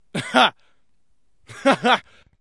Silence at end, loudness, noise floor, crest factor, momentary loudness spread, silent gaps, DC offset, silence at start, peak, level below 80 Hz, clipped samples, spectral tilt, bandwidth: 0.4 s; -19 LUFS; -70 dBFS; 22 dB; 5 LU; none; 0.2%; 0.15 s; -2 dBFS; -66 dBFS; under 0.1%; -3.5 dB/octave; 11.5 kHz